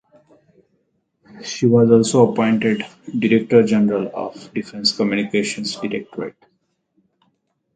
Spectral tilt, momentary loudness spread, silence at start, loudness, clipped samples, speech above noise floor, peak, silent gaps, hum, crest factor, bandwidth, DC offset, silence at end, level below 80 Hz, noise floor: -5.5 dB/octave; 16 LU; 1.35 s; -18 LUFS; under 0.1%; 50 dB; 0 dBFS; none; none; 18 dB; 9.4 kHz; under 0.1%; 1.45 s; -60 dBFS; -68 dBFS